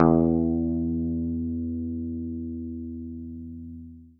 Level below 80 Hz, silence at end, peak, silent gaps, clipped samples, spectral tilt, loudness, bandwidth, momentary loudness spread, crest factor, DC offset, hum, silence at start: -42 dBFS; 0.1 s; -4 dBFS; none; under 0.1%; -14 dB/octave; -28 LUFS; 2.2 kHz; 16 LU; 24 dB; under 0.1%; none; 0 s